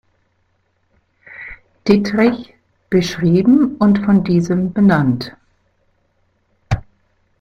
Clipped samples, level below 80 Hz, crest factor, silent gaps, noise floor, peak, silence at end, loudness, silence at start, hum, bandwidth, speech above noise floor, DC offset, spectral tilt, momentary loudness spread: under 0.1%; -42 dBFS; 16 dB; none; -63 dBFS; -2 dBFS; 0.6 s; -15 LUFS; 1.3 s; none; 7.4 kHz; 50 dB; under 0.1%; -7.5 dB/octave; 18 LU